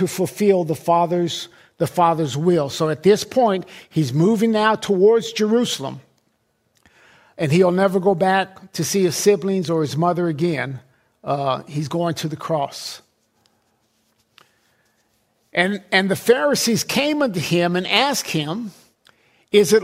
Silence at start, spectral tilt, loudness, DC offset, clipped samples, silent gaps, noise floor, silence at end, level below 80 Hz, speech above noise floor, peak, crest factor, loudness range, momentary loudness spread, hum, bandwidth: 0 s; -5 dB/octave; -19 LUFS; under 0.1%; under 0.1%; none; -67 dBFS; 0 s; -62 dBFS; 48 dB; -2 dBFS; 18 dB; 8 LU; 10 LU; none; 16 kHz